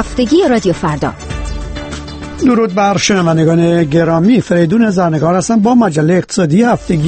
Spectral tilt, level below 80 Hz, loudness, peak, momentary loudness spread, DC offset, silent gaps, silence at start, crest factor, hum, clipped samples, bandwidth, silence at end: -6 dB/octave; -30 dBFS; -11 LUFS; 0 dBFS; 13 LU; under 0.1%; none; 0 s; 12 dB; none; under 0.1%; 8.8 kHz; 0 s